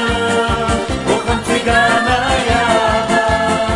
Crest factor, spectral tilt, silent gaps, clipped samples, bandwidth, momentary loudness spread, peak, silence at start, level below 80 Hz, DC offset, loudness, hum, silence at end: 14 dB; -4.5 dB/octave; none; under 0.1%; 11.5 kHz; 5 LU; 0 dBFS; 0 s; -28 dBFS; under 0.1%; -14 LUFS; none; 0 s